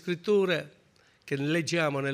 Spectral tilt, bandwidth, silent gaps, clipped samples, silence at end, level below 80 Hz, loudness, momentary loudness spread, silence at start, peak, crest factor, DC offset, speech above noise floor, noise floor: -5.5 dB/octave; 15.5 kHz; none; under 0.1%; 0 s; -74 dBFS; -28 LUFS; 9 LU; 0.05 s; -14 dBFS; 16 dB; under 0.1%; 35 dB; -63 dBFS